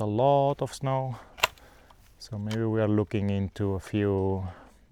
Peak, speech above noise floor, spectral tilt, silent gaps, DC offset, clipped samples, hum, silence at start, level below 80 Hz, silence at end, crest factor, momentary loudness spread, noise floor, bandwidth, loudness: -4 dBFS; 28 dB; -6.5 dB/octave; none; under 0.1%; under 0.1%; none; 0 s; -54 dBFS; 0.25 s; 24 dB; 13 LU; -55 dBFS; 18 kHz; -28 LUFS